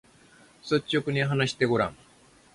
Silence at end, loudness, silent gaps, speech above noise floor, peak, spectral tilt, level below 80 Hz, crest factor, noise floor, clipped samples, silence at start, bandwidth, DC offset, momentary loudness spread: 0.6 s; -26 LUFS; none; 30 dB; -8 dBFS; -5.5 dB/octave; -60 dBFS; 20 dB; -56 dBFS; under 0.1%; 0.65 s; 11.5 kHz; under 0.1%; 5 LU